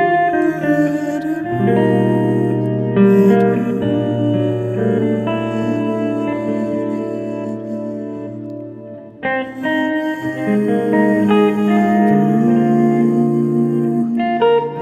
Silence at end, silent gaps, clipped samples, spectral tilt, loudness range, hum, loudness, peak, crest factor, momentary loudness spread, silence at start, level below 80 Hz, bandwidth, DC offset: 0 s; none; under 0.1%; -8.5 dB/octave; 8 LU; none; -16 LUFS; 0 dBFS; 14 dB; 11 LU; 0 s; -56 dBFS; 13 kHz; under 0.1%